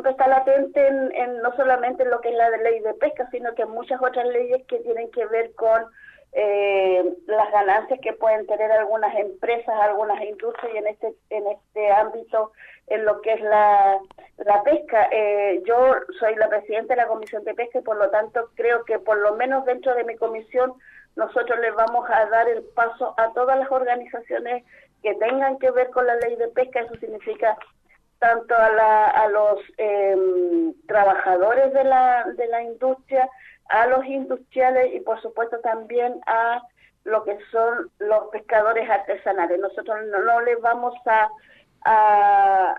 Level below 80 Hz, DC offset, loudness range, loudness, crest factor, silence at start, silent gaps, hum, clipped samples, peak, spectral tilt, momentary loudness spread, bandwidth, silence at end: -64 dBFS; under 0.1%; 4 LU; -21 LUFS; 14 dB; 0 s; none; none; under 0.1%; -6 dBFS; -6 dB/octave; 10 LU; 5.4 kHz; 0 s